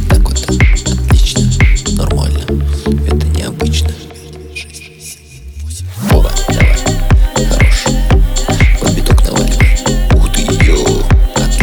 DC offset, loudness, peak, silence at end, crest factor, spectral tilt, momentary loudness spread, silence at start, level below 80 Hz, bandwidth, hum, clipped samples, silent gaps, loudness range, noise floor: under 0.1%; -12 LUFS; 0 dBFS; 0 s; 10 dB; -5 dB/octave; 16 LU; 0 s; -12 dBFS; 19.5 kHz; none; under 0.1%; none; 6 LU; -32 dBFS